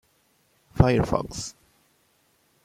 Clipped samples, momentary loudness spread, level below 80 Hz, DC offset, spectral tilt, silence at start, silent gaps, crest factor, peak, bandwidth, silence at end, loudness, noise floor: under 0.1%; 17 LU; -40 dBFS; under 0.1%; -6.5 dB/octave; 0.75 s; none; 24 dB; -2 dBFS; 15 kHz; 1.15 s; -24 LUFS; -66 dBFS